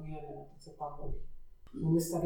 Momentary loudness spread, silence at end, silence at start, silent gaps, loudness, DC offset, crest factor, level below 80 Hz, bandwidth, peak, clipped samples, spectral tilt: 19 LU; 0 s; 0 s; none; -37 LUFS; under 0.1%; 16 dB; -46 dBFS; 18.5 kHz; -20 dBFS; under 0.1%; -7 dB/octave